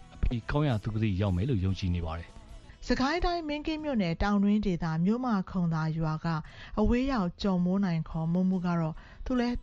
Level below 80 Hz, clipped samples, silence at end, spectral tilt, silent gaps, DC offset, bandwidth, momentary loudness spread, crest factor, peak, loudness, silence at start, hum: -40 dBFS; under 0.1%; 0 s; -7.5 dB/octave; none; under 0.1%; 7.6 kHz; 7 LU; 14 dB; -14 dBFS; -30 LUFS; 0 s; none